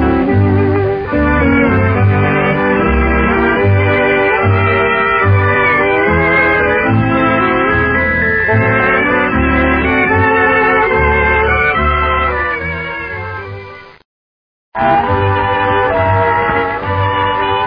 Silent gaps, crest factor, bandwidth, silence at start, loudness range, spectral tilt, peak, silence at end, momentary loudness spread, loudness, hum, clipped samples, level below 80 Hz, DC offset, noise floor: 14.05-14.72 s; 12 dB; 5.2 kHz; 0 s; 5 LU; -9.5 dB/octave; 0 dBFS; 0 s; 5 LU; -12 LUFS; none; under 0.1%; -26 dBFS; 0.1%; under -90 dBFS